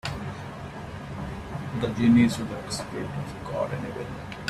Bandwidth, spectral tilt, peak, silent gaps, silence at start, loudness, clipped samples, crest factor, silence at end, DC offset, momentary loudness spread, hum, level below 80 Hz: 13 kHz; -6 dB/octave; -10 dBFS; none; 0.05 s; -28 LUFS; under 0.1%; 18 dB; 0 s; under 0.1%; 17 LU; none; -48 dBFS